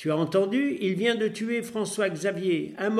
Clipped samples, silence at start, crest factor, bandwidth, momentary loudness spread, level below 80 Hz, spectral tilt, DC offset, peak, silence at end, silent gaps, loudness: under 0.1%; 0 s; 16 dB; 14.5 kHz; 5 LU; -74 dBFS; -5 dB/octave; under 0.1%; -10 dBFS; 0 s; none; -27 LUFS